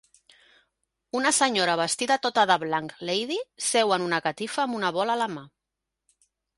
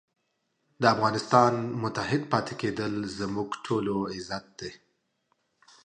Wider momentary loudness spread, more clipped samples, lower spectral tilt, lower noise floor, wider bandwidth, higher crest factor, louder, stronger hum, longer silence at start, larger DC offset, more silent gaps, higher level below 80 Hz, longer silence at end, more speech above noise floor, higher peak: second, 8 LU vs 14 LU; neither; second, -2 dB/octave vs -5.5 dB/octave; first, -85 dBFS vs -76 dBFS; first, 11.5 kHz vs 10 kHz; about the same, 20 dB vs 24 dB; first, -25 LUFS vs -28 LUFS; neither; first, 1.15 s vs 0.8 s; neither; neither; second, -72 dBFS vs -62 dBFS; about the same, 1.1 s vs 1.1 s; first, 60 dB vs 49 dB; about the same, -6 dBFS vs -6 dBFS